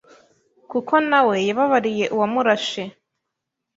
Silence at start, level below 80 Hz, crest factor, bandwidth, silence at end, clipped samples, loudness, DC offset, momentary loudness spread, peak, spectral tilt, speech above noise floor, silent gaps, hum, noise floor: 0.7 s; -68 dBFS; 18 dB; 7.8 kHz; 0.85 s; under 0.1%; -19 LUFS; under 0.1%; 11 LU; -2 dBFS; -4.5 dB/octave; 62 dB; none; none; -81 dBFS